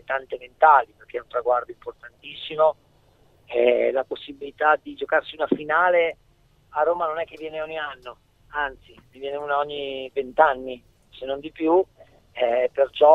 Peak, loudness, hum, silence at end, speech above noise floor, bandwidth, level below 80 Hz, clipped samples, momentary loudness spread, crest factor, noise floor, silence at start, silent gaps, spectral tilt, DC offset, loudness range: -2 dBFS; -23 LUFS; none; 0 s; 37 dB; 4.6 kHz; -60 dBFS; under 0.1%; 18 LU; 22 dB; -59 dBFS; 0.1 s; none; -6 dB/octave; under 0.1%; 6 LU